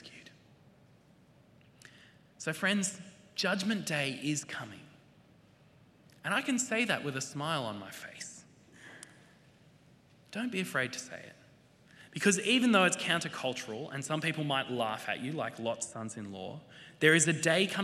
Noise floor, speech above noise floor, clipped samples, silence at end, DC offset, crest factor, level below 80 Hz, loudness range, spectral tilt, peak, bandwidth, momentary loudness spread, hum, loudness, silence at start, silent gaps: -62 dBFS; 30 dB; under 0.1%; 0 s; under 0.1%; 26 dB; -78 dBFS; 10 LU; -3.5 dB/octave; -10 dBFS; 15 kHz; 22 LU; none; -32 LUFS; 0 s; none